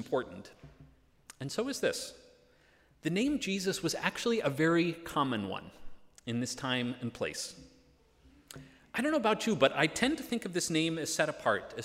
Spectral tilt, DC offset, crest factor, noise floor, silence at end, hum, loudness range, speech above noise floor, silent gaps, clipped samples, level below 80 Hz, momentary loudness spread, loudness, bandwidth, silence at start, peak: -4 dB/octave; under 0.1%; 22 dB; -65 dBFS; 0 s; none; 7 LU; 33 dB; none; under 0.1%; -64 dBFS; 16 LU; -32 LUFS; 16 kHz; 0 s; -12 dBFS